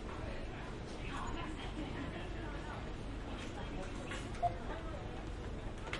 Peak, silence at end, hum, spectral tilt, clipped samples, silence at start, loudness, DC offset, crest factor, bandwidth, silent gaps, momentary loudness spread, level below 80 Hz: -24 dBFS; 0 s; none; -5.5 dB/octave; under 0.1%; 0 s; -44 LUFS; under 0.1%; 18 dB; 11.5 kHz; none; 6 LU; -46 dBFS